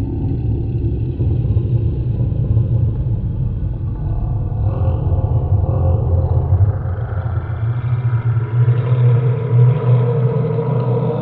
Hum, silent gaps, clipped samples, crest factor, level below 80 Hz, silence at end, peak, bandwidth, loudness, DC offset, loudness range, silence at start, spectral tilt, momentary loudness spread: none; none; under 0.1%; 12 dB; -26 dBFS; 0 s; -4 dBFS; 3.8 kHz; -17 LUFS; under 0.1%; 3 LU; 0 s; -10.5 dB/octave; 7 LU